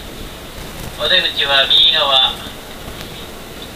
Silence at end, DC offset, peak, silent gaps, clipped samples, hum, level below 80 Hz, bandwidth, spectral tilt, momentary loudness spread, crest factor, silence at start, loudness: 0 s; under 0.1%; 0 dBFS; none; under 0.1%; none; -38 dBFS; 15.5 kHz; -2 dB/octave; 22 LU; 18 dB; 0 s; -11 LUFS